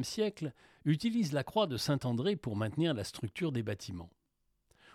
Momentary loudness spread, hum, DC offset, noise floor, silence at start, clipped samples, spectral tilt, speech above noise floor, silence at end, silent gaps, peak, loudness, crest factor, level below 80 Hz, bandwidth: 10 LU; none; under 0.1%; -79 dBFS; 0 s; under 0.1%; -6 dB/octave; 45 dB; 0.85 s; none; -18 dBFS; -34 LUFS; 18 dB; -66 dBFS; 16 kHz